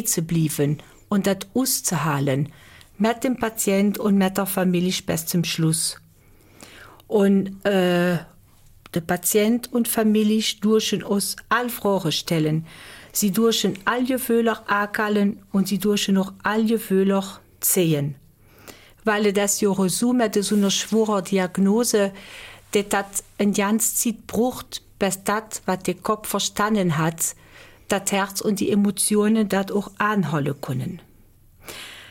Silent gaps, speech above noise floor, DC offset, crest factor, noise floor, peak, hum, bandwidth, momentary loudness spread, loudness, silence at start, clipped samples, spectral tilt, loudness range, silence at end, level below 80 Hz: none; 31 dB; under 0.1%; 16 dB; -52 dBFS; -6 dBFS; none; 17 kHz; 8 LU; -22 LUFS; 0 s; under 0.1%; -4.5 dB/octave; 2 LU; 0 s; -54 dBFS